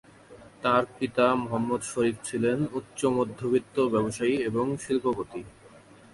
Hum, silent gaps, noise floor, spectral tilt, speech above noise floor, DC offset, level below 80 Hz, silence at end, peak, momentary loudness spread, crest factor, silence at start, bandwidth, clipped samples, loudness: none; none; -52 dBFS; -5.5 dB/octave; 25 dB; under 0.1%; -60 dBFS; 0.35 s; -10 dBFS; 5 LU; 18 dB; 0.3 s; 11.5 kHz; under 0.1%; -27 LUFS